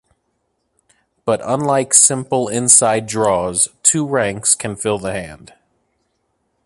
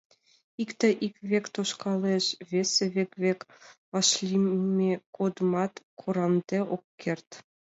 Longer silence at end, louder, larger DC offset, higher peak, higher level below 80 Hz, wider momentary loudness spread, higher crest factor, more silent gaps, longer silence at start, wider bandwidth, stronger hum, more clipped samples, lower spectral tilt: first, 1.3 s vs 0.35 s; first, -14 LUFS vs -28 LUFS; neither; first, 0 dBFS vs -10 dBFS; first, -52 dBFS vs -76 dBFS; about the same, 12 LU vs 10 LU; about the same, 18 dB vs 18 dB; second, none vs 3.78-3.92 s, 5.06-5.13 s, 5.85-5.97 s, 6.84-6.98 s, 7.27-7.31 s; first, 1.25 s vs 0.6 s; first, 16 kHz vs 8 kHz; neither; neither; second, -3 dB/octave vs -4.5 dB/octave